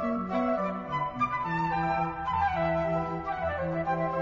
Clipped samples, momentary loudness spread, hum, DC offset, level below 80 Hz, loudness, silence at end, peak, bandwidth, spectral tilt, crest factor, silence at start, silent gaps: under 0.1%; 4 LU; none; under 0.1%; -50 dBFS; -29 LUFS; 0 s; -16 dBFS; 7.4 kHz; -8 dB/octave; 12 dB; 0 s; none